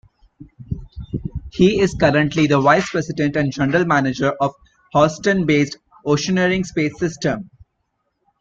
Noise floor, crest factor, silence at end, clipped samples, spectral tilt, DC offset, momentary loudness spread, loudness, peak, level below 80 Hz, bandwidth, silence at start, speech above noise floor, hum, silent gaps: -71 dBFS; 18 dB; 0.95 s; under 0.1%; -6 dB/octave; under 0.1%; 14 LU; -18 LUFS; -2 dBFS; -42 dBFS; 7.8 kHz; 0.4 s; 54 dB; none; none